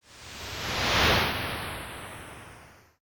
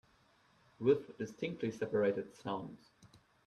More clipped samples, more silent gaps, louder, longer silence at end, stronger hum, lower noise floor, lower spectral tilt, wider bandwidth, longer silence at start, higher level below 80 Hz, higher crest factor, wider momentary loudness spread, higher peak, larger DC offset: neither; neither; first, -26 LUFS vs -37 LUFS; about the same, 0.35 s vs 0.4 s; neither; second, -52 dBFS vs -70 dBFS; second, -3 dB/octave vs -7 dB/octave; first, 19.5 kHz vs 10.5 kHz; second, 0.1 s vs 0.8 s; first, -44 dBFS vs -76 dBFS; about the same, 20 dB vs 20 dB; first, 22 LU vs 10 LU; first, -10 dBFS vs -18 dBFS; neither